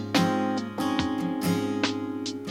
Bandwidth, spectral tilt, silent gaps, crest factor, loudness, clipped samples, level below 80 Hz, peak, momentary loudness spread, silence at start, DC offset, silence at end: 16 kHz; -5 dB/octave; none; 20 dB; -27 LUFS; under 0.1%; -58 dBFS; -8 dBFS; 7 LU; 0 s; under 0.1%; 0 s